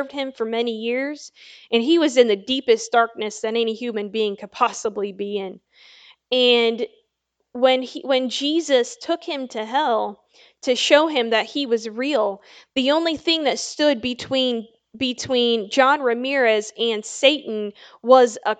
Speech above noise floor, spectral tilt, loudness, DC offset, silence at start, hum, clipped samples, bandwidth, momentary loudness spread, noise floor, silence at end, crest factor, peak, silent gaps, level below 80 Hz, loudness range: 55 dB; -2.5 dB/octave; -20 LUFS; under 0.1%; 0 s; none; under 0.1%; 9.2 kHz; 12 LU; -75 dBFS; 0.05 s; 20 dB; 0 dBFS; none; -68 dBFS; 3 LU